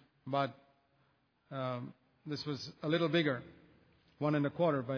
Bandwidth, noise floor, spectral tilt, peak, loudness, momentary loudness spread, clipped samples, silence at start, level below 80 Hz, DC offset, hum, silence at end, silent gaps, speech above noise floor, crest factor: 5.4 kHz; -74 dBFS; -5 dB/octave; -18 dBFS; -36 LUFS; 12 LU; under 0.1%; 0.25 s; -76 dBFS; under 0.1%; none; 0 s; none; 39 dB; 18 dB